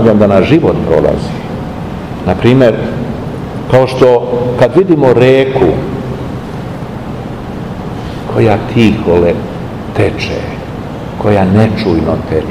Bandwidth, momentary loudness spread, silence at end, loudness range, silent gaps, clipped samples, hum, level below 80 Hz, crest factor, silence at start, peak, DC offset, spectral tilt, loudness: 15 kHz; 14 LU; 0 s; 4 LU; none; 2%; none; -30 dBFS; 10 dB; 0 s; 0 dBFS; 0.7%; -8 dB/octave; -11 LUFS